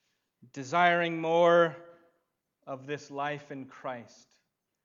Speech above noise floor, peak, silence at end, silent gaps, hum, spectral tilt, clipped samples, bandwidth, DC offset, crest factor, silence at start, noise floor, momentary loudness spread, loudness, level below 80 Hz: 50 dB; -10 dBFS; 0.8 s; none; none; -5.5 dB/octave; under 0.1%; 7.6 kHz; under 0.1%; 22 dB; 0.55 s; -79 dBFS; 21 LU; -27 LUFS; -84 dBFS